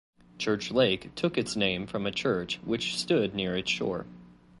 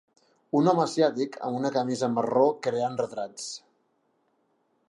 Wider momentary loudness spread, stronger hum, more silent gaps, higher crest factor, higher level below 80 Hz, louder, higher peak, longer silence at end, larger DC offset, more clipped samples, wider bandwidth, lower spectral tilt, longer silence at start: second, 6 LU vs 12 LU; neither; neither; about the same, 18 dB vs 20 dB; first, -58 dBFS vs -80 dBFS; second, -29 LUFS vs -26 LUFS; second, -12 dBFS vs -8 dBFS; second, 0.25 s vs 1.3 s; neither; neither; about the same, 11.5 kHz vs 11.5 kHz; about the same, -4.5 dB/octave vs -5.5 dB/octave; second, 0.4 s vs 0.55 s